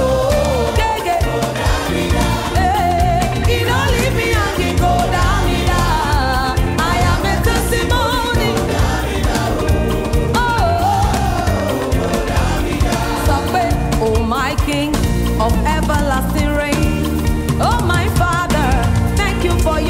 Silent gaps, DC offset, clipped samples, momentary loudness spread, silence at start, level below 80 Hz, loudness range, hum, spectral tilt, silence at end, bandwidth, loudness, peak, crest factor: none; under 0.1%; under 0.1%; 2 LU; 0 s; -20 dBFS; 1 LU; none; -5.5 dB/octave; 0 s; 16.5 kHz; -16 LUFS; -6 dBFS; 10 dB